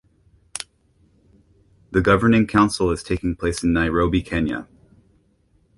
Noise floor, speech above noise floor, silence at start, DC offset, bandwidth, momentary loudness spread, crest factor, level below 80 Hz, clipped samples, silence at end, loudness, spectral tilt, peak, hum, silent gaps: -61 dBFS; 42 dB; 0.55 s; under 0.1%; 11.5 kHz; 17 LU; 20 dB; -38 dBFS; under 0.1%; 1.15 s; -20 LUFS; -6 dB/octave; -2 dBFS; none; none